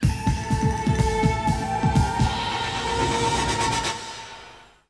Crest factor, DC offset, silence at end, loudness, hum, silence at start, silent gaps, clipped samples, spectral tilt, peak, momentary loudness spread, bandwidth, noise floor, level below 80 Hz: 16 dB; under 0.1%; 0.25 s; -23 LUFS; none; 0 s; none; under 0.1%; -5 dB/octave; -6 dBFS; 9 LU; 11 kHz; -47 dBFS; -32 dBFS